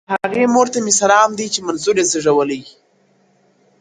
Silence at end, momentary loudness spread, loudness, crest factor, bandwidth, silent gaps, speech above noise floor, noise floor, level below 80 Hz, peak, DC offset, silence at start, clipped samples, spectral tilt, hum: 1.1 s; 8 LU; -15 LUFS; 16 dB; 10 kHz; none; 42 dB; -57 dBFS; -60 dBFS; 0 dBFS; under 0.1%; 0.1 s; under 0.1%; -2.5 dB/octave; none